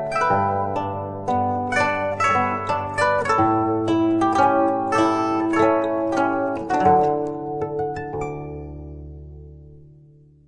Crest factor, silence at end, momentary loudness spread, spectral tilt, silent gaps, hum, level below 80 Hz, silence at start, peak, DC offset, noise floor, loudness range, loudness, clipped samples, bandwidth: 18 dB; 0.6 s; 14 LU; -6.5 dB/octave; none; none; -48 dBFS; 0 s; -4 dBFS; under 0.1%; -50 dBFS; 5 LU; -21 LUFS; under 0.1%; 10 kHz